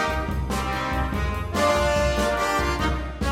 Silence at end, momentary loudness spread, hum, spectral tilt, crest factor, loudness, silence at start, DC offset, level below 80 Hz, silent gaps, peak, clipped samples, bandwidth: 0 s; 6 LU; none; -5 dB/octave; 14 dB; -24 LUFS; 0 s; under 0.1%; -30 dBFS; none; -10 dBFS; under 0.1%; 16 kHz